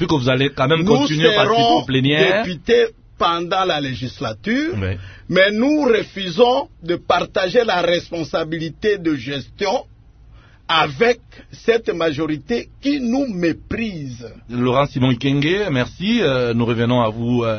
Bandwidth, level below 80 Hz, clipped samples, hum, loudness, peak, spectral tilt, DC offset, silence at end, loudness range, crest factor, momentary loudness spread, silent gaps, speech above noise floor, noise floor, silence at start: 6.6 kHz; -46 dBFS; under 0.1%; none; -18 LUFS; 0 dBFS; -6 dB/octave; under 0.1%; 0 s; 5 LU; 18 dB; 10 LU; none; 27 dB; -45 dBFS; 0 s